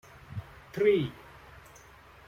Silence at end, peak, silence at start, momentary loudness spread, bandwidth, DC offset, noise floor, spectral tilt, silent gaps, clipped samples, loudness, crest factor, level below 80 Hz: 1.15 s; -12 dBFS; 0.3 s; 26 LU; 15 kHz; under 0.1%; -54 dBFS; -7 dB/octave; none; under 0.1%; -28 LUFS; 20 dB; -60 dBFS